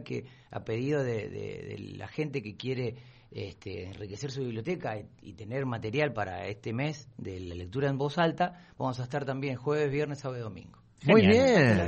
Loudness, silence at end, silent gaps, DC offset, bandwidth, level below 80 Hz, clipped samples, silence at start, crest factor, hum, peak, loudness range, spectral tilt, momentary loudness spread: -30 LUFS; 0 s; none; under 0.1%; 8.4 kHz; -60 dBFS; under 0.1%; 0 s; 22 dB; none; -8 dBFS; 9 LU; -6.5 dB/octave; 19 LU